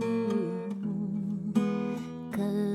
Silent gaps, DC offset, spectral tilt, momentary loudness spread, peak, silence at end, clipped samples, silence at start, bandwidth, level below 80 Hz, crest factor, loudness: none; under 0.1%; -8 dB/octave; 6 LU; -14 dBFS; 0 s; under 0.1%; 0 s; 13 kHz; -66 dBFS; 16 dB; -32 LUFS